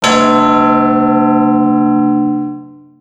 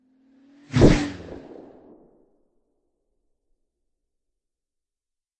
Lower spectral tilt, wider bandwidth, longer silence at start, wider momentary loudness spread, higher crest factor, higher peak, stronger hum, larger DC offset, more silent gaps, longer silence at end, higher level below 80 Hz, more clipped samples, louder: second, -5 dB/octave vs -7 dB/octave; about the same, 10 kHz vs 9.2 kHz; second, 0 s vs 0.75 s; second, 9 LU vs 24 LU; second, 10 dB vs 26 dB; about the same, 0 dBFS vs -2 dBFS; neither; neither; neither; second, 0.3 s vs 4.05 s; second, -46 dBFS vs -36 dBFS; neither; first, -11 LUFS vs -20 LUFS